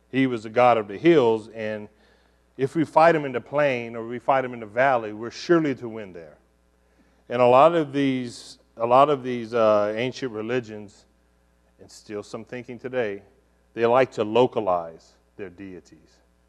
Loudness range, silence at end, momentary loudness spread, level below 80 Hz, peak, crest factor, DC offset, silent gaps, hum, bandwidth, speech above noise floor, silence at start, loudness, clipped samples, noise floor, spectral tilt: 7 LU; 0.7 s; 20 LU; -64 dBFS; -4 dBFS; 20 dB; under 0.1%; none; none; 11 kHz; 40 dB; 0.15 s; -22 LUFS; under 0.1%; -62 dBFS; -6.5 dB/octave